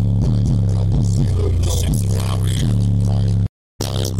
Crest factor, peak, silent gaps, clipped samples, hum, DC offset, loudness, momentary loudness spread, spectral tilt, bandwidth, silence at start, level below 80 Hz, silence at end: 8 dB; -8 dBFS; 3.49-3.79 s; under 0.1%; none; under 0.1%; -18 LUFS; 4 LU; -6.5 dB/octave; 16.5 kHz; 0 s; -26 dBFS; 0 s